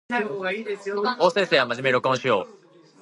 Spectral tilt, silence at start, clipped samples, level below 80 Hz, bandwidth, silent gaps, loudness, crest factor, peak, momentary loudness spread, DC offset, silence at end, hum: -4.5 dB/octave; 0.1 s; under 0.1%; -72 dBFS; 11.5 kHz; none; -23 LUFS; 20 dB; -4 dBFS; 8 LU; under 0.1%; 0.5 s; none